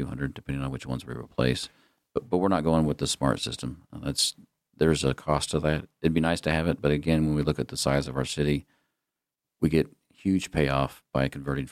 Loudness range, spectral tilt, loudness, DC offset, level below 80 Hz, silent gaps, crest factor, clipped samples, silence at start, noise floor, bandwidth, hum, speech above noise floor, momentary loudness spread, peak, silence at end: 3 LU; -5.5 dB/octave; -27 LUFS; under 0.1%; -44 dBFS; none; 20 dB; under 0.1%; 0 s; -87 dBFS; 15 kHz; none; 60 dB; 10 LU; -8 dBFS; 0 s